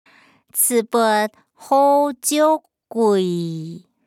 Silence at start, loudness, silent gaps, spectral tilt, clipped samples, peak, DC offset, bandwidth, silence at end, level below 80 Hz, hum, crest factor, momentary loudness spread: 0.55 s; -18 LUFS; none; -4 dB/octave; under 0.1%; -6 dBFS; under 0.1%; 19.5 kHz; 0.3 s; -78 dBFS; none; 14 dB; 12 LU